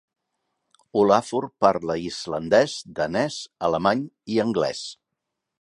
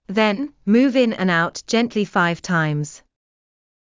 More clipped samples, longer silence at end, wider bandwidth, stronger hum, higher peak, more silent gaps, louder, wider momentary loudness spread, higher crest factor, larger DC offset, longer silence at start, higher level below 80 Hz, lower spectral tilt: neither; second, 0.7 s vs 0.9 s; first, 11.5 kHz vs 7.6 kHz; neither; about the same, -2 dBFS vs -4 dBFS; neither; second, -23 LUFS vs -19 LUFS; first, 10 LU vs 7 LU; first, 22 dB vs 16 dB; neither; first, 0.95 s vs 0.1 s; about the same, -58 dBFS vs -60 dBFS; about the same, -5 dB/octave vs -5.5 dB/octave